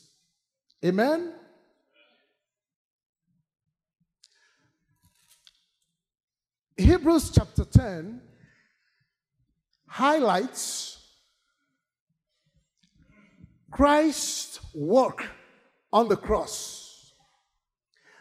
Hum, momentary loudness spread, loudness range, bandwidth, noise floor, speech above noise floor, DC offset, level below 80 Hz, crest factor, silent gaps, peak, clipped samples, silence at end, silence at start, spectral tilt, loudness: none; 18 LU; 7 LU; 15.5 kHz; -81 dBFS; 58 dB; under 0.1%; -40 dBFS; 24 dB; 2.76-2.99 s, 3.06-3.13 s, 6.24-6.28 s, 12.00-12.07 s; -4 dBFS; under 0.1%; 1.35 s; 0.85 s; -5.5 dB/octave; -24 LUFS